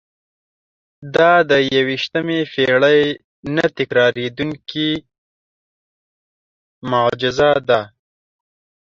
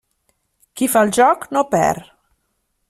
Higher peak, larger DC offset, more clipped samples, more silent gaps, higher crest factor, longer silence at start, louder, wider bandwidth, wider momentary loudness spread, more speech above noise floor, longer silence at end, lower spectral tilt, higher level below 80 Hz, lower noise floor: about the same, -2 dBFS vs -2 dBFS; neither; neither; first, 3.24-3.43 s, 5.18-6.81 s vs none; about the same, 16 dB vs 16 dB; first, 1 s vs 0.75 s; about the same, -16 LUFS vs -16 LUFS; second, 7.4 kHz vs 16 kHz; about the same, 11 LU vs 12 LU; first, over 74 dB vs 54 dB; about the same, 0.95 s vs 0.9 s; first, -5.5 dB/octave vs -4 dB/octave; about the same, -54 dBFS vs -56 dBFS; first, under -90 dBFS vs -70 dBFS